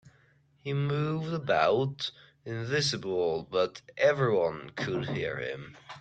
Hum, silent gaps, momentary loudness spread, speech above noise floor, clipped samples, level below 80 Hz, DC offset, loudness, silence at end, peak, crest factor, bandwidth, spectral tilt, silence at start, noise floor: none; none; 12 LU; 35 dB; under 0.1%; -66 dBFS; under 0.1%; -30 LUFS; 0 s; -12 dBFS; 18 dB; 9 kHz; -5.5 dB/octave; 0.05 s; -64 dBFS